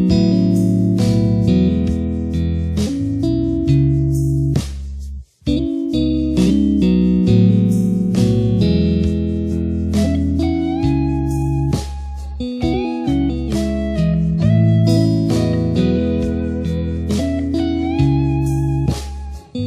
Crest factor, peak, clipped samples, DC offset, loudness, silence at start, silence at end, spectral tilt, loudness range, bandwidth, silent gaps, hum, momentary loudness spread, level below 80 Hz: 14 dB; -2 dBFS; under 0.1%; under 0.1%; -17 LUFS; 0 s; 0 s; -8 dB/octave; 4 LU; 13.5 kHz; none; none; 7 LU; -28 dBFS